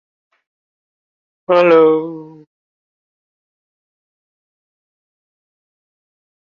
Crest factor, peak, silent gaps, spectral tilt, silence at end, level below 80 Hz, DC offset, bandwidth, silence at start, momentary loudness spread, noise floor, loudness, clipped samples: 20 dB; -2 dBFS; none; -7.5 dB/octave; 4.35 s; -70 dBFS; under 0.1%; 5.6 kHz; 1.5 s; 24 LU; under -90 dBFS; -12 LUFS; under 0.1%